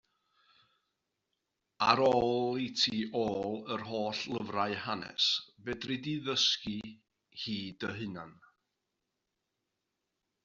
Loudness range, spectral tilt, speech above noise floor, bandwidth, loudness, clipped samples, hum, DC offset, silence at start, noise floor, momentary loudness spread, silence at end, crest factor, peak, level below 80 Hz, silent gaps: 12 LU; -2 dB/octave; 52 dB; 7.8 kHz; -32 LUFS; under 0.1%; none; under 0.1%; 1.8 s; -85 dBFS; 14 LU; 2.1 s; 28 dB; -6 dBFS; -68 dBFS; none